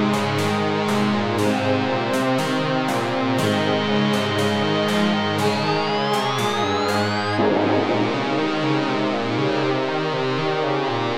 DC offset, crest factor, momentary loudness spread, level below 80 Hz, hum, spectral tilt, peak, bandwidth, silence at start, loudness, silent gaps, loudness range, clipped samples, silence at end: 0.5%; 12 dB; 2 LU; -62 dBFS; none; -5.5 dB/octave; -8 dBFS; 16 kHz; 0 s; -21 LUFS; none; 1 LU; under 0.1%; 0 s